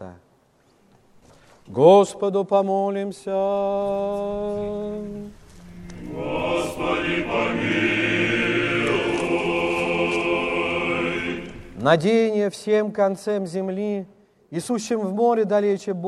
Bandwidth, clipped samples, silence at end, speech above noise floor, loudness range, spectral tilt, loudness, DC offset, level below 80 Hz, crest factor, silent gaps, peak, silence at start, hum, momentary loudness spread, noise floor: 13 kHz; under 0.1%; 0 s; 39 dB; 6 LU; -5.5 dB/octave; -22 LUFS; under 0.1%; -52 dBFS; 20 dB; none; -2 dBFS; 0 s; none; 13 LU; -60 dBFS